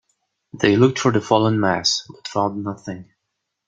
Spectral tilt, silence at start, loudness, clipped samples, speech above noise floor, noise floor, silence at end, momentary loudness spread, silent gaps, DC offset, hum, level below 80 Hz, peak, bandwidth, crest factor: -5 dB/octave; 0.55 s; -19 LUFS; under 0.1%; 59 dB; -78 dBFS; 0.65 s; 15 LU; none; under 0.1%; none; -58 dBFS; -2 dBFS; 9.2 kHz; 18 dB